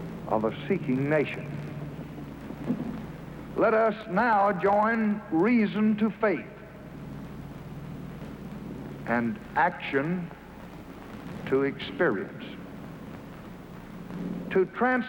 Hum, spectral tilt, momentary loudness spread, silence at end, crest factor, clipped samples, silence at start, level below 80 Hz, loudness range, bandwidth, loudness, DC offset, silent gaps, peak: none; -8 dB/octave; 19 LU; 0 s; 18 dB; under 0.1%; 0 s; -54 dBFS; 7 LU; 16.5 kHz; -27 LUFS; under 0.1%; none; -12 dBFS